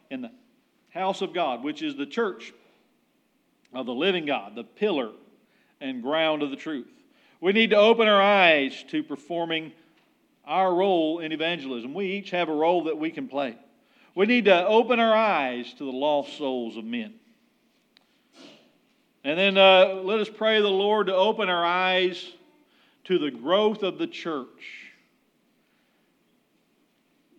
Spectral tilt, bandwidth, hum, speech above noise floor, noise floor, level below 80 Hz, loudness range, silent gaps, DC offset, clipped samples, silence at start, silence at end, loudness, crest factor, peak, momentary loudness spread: -5.5 dB/octave; 8.6 kHz; none; 44 dB; -68 dBFS; under -90 dBFS; 10 LU; none; under 0.1%; under 0.1%; 0.1 s; 2.5 s; -24 LUFS; 22 dB; -4 dBFS; 18 LU